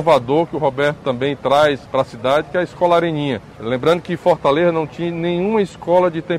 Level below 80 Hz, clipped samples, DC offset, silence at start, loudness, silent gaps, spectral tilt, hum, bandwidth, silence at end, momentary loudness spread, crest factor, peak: -50 dBFS; under 0.1%; under 0.1%; 0 s; -18 LUFS; none; -6.5 dB/octave; none; 12 kHz; 0 s; 7 LU; 14 dB; -2 dBFS